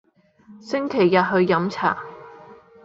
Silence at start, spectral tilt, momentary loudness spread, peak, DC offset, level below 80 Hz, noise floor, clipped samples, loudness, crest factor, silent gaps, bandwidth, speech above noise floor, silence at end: 0.5 s; -7 dB/octave; 15 LU; -4 dBFS; under 0.1%; -64 dBFS; -51 dBFS; under 0.1%; -21 LUFS; 20 dB; none; 7.6 kHz; 31 dB; 0.3 s